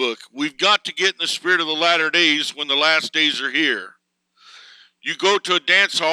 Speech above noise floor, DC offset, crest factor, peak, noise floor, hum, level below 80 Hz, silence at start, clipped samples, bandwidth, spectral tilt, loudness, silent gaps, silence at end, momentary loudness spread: 41 dB; under 0.1%; 18 dB; -2 dBFS; -61 dBFS; none; -80 dBFS; 0 s; under 0.1%; 15 kHz; -1.5 dB/octave; -17 LUFS; none; 0 s; 10 LU